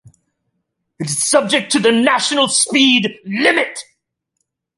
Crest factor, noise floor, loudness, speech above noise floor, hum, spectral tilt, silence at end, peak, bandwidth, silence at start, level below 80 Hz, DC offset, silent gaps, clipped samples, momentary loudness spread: 16 dB; -73 dBFS; -14 LUFS; 58 dB; none; -2 dB/octave; 0.95 s; 0 dBFS; 11.5 kHz; 1 s; -64 dBFS; under 0.1%; none; under 0.1%; 10 LU